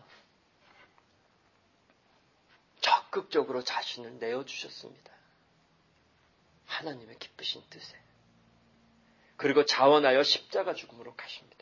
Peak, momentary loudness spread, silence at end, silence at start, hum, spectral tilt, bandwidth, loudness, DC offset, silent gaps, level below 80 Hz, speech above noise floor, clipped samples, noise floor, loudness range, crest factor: -10 dBFS; 24 LU; 0.2 s; 2.8 s; none; -3 dB/octave; 7.4 kHz; -28 LUFS; under 0.1%; none; -80 dBFS; 38 dB; under 0.1%; -68 dBFS; 14 LU; 24 dB